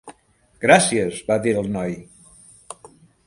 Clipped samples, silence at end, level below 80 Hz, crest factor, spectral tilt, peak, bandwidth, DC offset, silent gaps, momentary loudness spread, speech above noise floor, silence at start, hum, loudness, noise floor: under 0.1%; 0.55 s; -54 dBFS; 22 dB; -4 dB/octave; 0 dBFS; 11.5 kHz; under 0.1%; none; 25 LU; 36 dB; 0.05 s; none; -19 LUFS; -55 dBFS